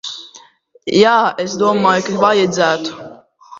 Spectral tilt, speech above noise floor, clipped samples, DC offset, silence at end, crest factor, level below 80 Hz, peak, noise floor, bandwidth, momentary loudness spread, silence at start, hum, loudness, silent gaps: -4.5 dB/octave; 33 dB; under 0.1%; under 0.1%; 0 s; 16 dB; -56 dBFS; 0 dBFS; -46 dBFS; 7.8 kHz; 17 LU; 0.05 s; none; -14 LUFS; none